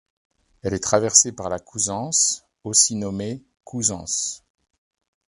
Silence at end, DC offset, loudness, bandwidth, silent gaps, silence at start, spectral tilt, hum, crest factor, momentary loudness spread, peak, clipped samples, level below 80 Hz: 0.9 s; under 0.1%; -20 LUFS; 11.5 kHz; none; 0.65 s; -2.5 dB/octave; none; 24 dB; 17 LU; 0 dBFS; under 0.1%; -52 dBFS